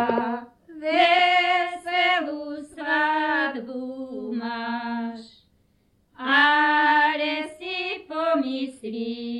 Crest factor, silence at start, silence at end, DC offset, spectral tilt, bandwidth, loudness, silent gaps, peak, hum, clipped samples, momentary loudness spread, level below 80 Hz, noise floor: 18 dB; 0 s; 0 s; under 0.1%; -3.5 dB/octave; 11.5 kHz; -23 LUFS; none; -8 dBFS; none; under 0.1%; 16 LU; -68 dBFS; -65 dBFS